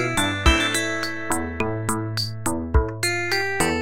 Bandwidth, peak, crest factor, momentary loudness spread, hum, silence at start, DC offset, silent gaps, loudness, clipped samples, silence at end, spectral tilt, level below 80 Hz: 16.5 kHz; -4 dBFS; 20 dB; 8 LU; none; 0 s; 1%; none; -23 LUFS; under 0.1%; 0 s; -3.5 dB/octave; -30 dBFS